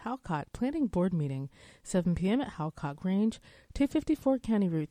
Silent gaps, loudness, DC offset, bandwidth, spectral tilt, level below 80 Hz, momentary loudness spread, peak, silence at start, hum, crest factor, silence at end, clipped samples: none; -31 LUFS; under 0.1%; 13 kHz; -7.5 dB/octave; -52 dBFS; 9 LU; -14 dBFS; 0 s; none; 16 dB; 0.05 s; under 0.1%